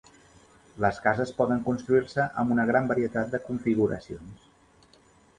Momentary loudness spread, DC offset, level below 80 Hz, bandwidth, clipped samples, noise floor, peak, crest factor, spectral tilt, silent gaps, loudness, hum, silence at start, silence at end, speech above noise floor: 6 LU; under 0.1%; -56 dBFS; 9.6 kHz; under 0.1%; -59 dBFS; -8 dBFS; 20 dB; -7.5 dB/octave; none; -26 LUFS; none; 0.75 s; 1.05 s; 33 dB